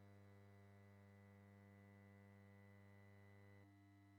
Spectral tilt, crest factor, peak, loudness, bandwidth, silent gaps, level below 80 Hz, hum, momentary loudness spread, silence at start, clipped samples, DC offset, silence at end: -7 dB/octave; 10 dB; -56 dBFS; -68 LUFS; 6.6 kHz; none; under -90 dBFS; none; 1 LU; 0 s; under 0.1%; under 0.1%; 0 s